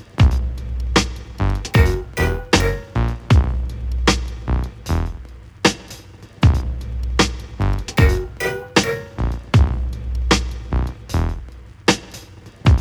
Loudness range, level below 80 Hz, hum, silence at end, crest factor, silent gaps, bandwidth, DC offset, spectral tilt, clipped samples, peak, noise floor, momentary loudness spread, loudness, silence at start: 2 LU; -22 dBFS; none; 0 s; 18 dB; none; over 20 kHz; under 0.1%; -5 dB/octave; under 0.1%; 0 dBFS; -39 dBFS; 10 LU; -20 LUFS; 0 s